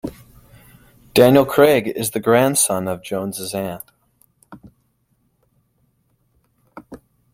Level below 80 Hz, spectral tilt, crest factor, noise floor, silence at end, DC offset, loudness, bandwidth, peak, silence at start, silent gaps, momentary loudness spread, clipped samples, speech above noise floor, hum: -54 dBFS; -4.5 dB/octave; 20 dB; -65 dBFS; 0.4 s; under 0.1%; -17 LUFS; 16.5 kHz; -2 dBFS; 0.05 s; none; 22 LU; under 0.1%; 49 dB; none